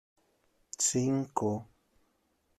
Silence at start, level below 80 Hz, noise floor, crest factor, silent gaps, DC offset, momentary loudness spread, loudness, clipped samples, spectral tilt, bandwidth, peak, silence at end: 0.8 s; -70 dBFS; -75 dBFS; 20 dB; none; under 0.1%; 11 LU; -31 LUFS; under 0.1%; -4.5 dB/octave; 14.5 kHz; -14 dBFS; 0.95 s